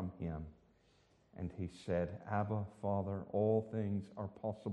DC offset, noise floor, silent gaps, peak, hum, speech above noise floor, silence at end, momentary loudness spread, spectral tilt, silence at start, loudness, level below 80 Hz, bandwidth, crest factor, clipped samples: under 0.1%; -71 dBFS; none; -22 dBFS; none; 32 dB; 0 s; 13 LU; -9 dB/octave; 0 s; -40 LUFS; -62 dBFS; 9.2 kHz; 18 dB; under 0.1%